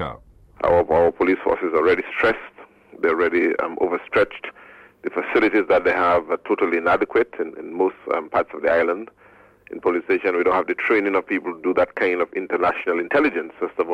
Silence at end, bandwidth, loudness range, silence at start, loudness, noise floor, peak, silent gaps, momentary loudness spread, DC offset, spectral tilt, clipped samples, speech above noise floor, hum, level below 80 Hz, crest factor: 0 s; 8.2 kHz; 3 LU; 0 s; -21 LUFS; -50 dBFS; -8 dBFS; none; 9 LU; under 0.1%; -7 dB/octave; under 0.1%; 29 dB; none; -52 dBFS; 14 dB